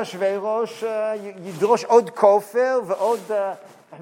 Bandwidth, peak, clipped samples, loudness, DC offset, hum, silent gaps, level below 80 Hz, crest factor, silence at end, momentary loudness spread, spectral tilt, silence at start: 16.5 kHz; -2 dBFS; under 0.1%; -21 LUFS; under 0.1%; none; none; -82 dBFS; 18 dB; 0 s; 12 LU; -5 dB/octave; 0 s